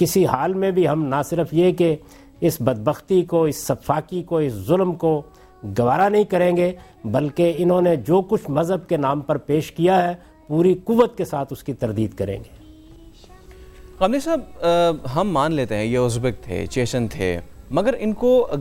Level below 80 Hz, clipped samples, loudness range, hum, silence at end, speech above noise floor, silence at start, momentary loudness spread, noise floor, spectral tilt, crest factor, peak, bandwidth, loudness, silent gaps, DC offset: -46 dBFS; under 0.1%; 4 LU; none; 0 s; 25 dB; 0 s; 8 LU; -45 dBFS; -6.5 dB/octave; 18 dB; -2 dBFS; 16.5 kHz; -20 LUFS; none; under 0.1%